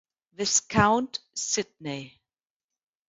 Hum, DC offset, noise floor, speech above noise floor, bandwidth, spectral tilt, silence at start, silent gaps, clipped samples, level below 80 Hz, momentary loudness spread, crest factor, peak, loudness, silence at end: none; under 0.1%; under -90 dBFS; over 63 dB; 8 kHz; -3 dB/octave; 0.4 s; none; under 0.1%; -54 dBFS; 14 LU; 24 dB; -4 dBFS; -26 LUFS; 1 s